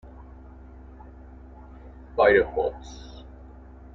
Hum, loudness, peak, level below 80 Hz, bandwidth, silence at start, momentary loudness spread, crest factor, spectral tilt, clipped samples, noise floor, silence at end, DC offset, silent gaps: none; -22 LUFS; -6 dBFS; -44 dBFS; 7.4 kHz; 0.2 s; 28 LU; 22 dB; -6 dB/octave; under 0.1%; -45 dBFS; 0.7 s; under 0.1%; none